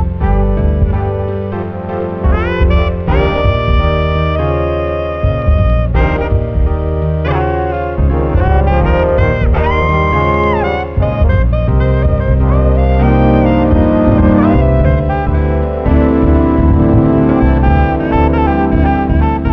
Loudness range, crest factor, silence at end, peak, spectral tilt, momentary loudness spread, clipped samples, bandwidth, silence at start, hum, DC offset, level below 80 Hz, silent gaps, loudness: 4 LU; 10 dB; 0 s; 0 dBFS; -10 dB/octave; 6 LU; under 0.1%; 5.2 kHz; 0 s; none; 0.4%; -14 dBFS; none; -12 LUFS